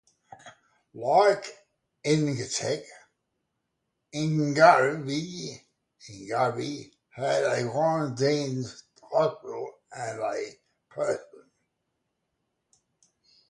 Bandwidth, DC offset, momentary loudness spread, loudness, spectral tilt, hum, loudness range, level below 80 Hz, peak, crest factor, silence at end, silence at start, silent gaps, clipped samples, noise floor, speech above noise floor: 11.5 kHz; under 0.1%; 19 LU; -26 LUFS; -5 dB/octave; none; 10 LU; -72 dBFS; -4 dBFS; 24 dB; 2.25 s; 0.45 s; none; under 0.1%; -80 dBFS; 55 dB